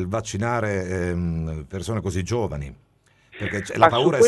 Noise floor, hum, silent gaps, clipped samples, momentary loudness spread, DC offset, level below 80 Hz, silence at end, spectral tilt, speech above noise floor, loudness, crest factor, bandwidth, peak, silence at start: -55 dBFS; none; none; under 0.1%; 13 LU; under 0.1%; -40 dBFS; 0 s; -5.5 dB/octave; 33 dB; -24 LUFS; 22 dB; 12.5 kHz; 0 dBFS; 0 s